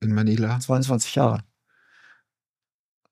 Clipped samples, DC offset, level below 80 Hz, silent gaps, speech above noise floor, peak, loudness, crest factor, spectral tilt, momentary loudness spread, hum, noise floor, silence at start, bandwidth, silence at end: under 0.1%; under 0.1%; -66 dBFS; none; over 68 dB; -4 dBFS; -23 LUFS; 20 dB; -6 dB/octave; 2 LU; none; under -90 dBFS; 0 s; 15 kHz; 1.7 s